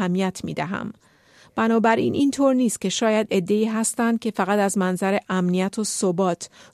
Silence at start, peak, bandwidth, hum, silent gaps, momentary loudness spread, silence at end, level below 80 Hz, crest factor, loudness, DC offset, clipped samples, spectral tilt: 0 s; -6 dBFS; 14.5 kHz; none; none; 8 LU; 0.1 s; -62 dBFS; 16 dB; -22 LUFS; under 0.1%; under 0.1%; -5 dB/octave